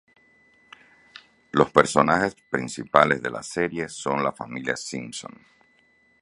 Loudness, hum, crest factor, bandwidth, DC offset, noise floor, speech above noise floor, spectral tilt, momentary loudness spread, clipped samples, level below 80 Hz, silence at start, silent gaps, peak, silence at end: -23 LUFS; none; 26 dB; 11.5 kHz; under 0.1%; -62 dBFS; 38 dB; -4.5 dB/octave; 13 LU; under 0.1%; -58 dBFS; 1.55 s; none; 0 dBFS; 0.95 s